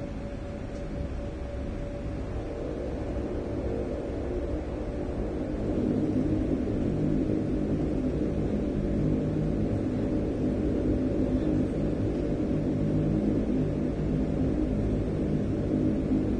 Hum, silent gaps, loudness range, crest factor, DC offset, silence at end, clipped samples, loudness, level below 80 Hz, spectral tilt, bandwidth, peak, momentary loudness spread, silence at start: none; none; 6 LU; 14 dB; under 0.1%; 0 s; under 0.1%; -29 LUFS; -36 dBFS; -9.5 dB/octave; 9.4 kHz; -14 dBFS; 8 LU; 0 s